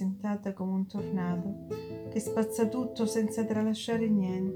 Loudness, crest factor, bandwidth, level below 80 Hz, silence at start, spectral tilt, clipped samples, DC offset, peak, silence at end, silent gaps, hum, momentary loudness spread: -32 LUFS; 16 dB; 17 kHz; -64 dBFS; 0 s; -6.5 dB/octave; under 0.1%; under 0.1%; -16 dBFS; 0 s; none; none; 8 LU